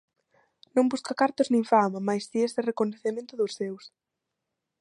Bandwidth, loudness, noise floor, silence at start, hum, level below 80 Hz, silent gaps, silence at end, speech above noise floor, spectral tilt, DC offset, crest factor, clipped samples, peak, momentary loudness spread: 11 kHz; -27 LUFS; -84 dBFS; 0.75 s; none; -78 dBFS; none; 0.9 s; 58 dB; -5.5 dB/octave; under 0.1%; 20 dB; under 0.1%; -8 dBFS; 10 LU